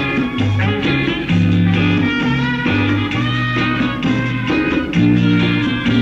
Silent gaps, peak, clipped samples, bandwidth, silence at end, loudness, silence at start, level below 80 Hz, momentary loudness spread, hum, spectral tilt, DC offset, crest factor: none; -2 dBFS; under 0.1%; 7.6 kHz; 0 s; -16 LUFS; 0 s; -38 dBFS; 4 LU; none; -7 dB/octave; under 0.1%; 12 dB